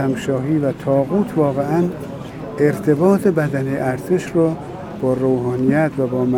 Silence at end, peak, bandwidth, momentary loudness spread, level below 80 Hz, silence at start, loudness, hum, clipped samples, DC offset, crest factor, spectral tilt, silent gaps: 0 s; -2 dBFS; 17.5 kHz; 8 LU; -48 dBFS; 0 s; -18 LUFS; none; under 0.1%; under 0.1%; 16 dB; -8 dB/octave; none